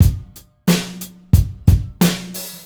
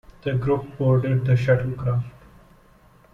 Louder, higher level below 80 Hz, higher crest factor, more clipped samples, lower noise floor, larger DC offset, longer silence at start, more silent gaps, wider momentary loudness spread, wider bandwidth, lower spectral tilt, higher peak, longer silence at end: first, -18 LUFS vs -22 LUFS; first, -24 dBFS vs -48 dBFS; about the same, 18 dB vs 16 dB; neither; second, -38 dBFS vs -53 dBFS; neither; second, 0 s vs 0.25 s; neither; first, 13 LU vs 8 LU; first, over 20 kHz vs 5.6 kHz; second, -5.5 dB/octave vs -9.5 dB/octave; first, 0 dBFS vs -6 dBFS; second, 0.05 s vs 1.05 s